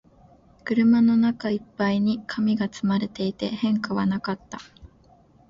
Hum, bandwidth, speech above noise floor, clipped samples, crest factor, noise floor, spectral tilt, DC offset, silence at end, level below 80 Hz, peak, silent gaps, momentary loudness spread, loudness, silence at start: none; 7.4 kHz; 33 dB; under 0.1%; 14 dB; -56 dBFS; -7 dB/octave; under 0.1%; 0.65 s; -58 dBFS; -10 dBFS; none; 13 LU; -24 LUFS; 0.65 s